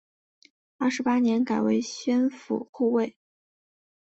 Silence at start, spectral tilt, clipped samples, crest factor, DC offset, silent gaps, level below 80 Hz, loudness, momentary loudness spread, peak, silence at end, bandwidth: 0.8 s; -5 dB/octave; under 0.1%; 14 dB; under 0.1%; 2.69-2.73 s; -72 dBFS; -26 LUFS; 7 LU; -12 dBFS; 0.95 s; 8 kHz